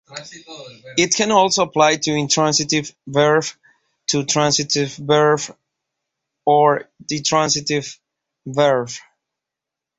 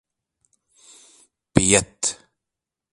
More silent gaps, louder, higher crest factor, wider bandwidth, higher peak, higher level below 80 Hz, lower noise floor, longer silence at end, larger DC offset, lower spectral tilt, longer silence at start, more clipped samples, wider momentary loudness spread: neither; about the same, -17 LUFS vs -19 LUFS; second, 18 dB vs 26 dB; second, 8.4 kHz vs 11.5 kHz; about the same, -2 dBFS vs 0 dBFS; second, -60 dBFS vs -46 dBFS; about the same, -85 dBFS vs -86 dBFS; first, 1 s vs 0.8 s; neither; about the same, -3 dB/octave vs -3 dB/octave; second, 0.1 s vs 1.55 s; neither; first, 19 LU vs 11 LU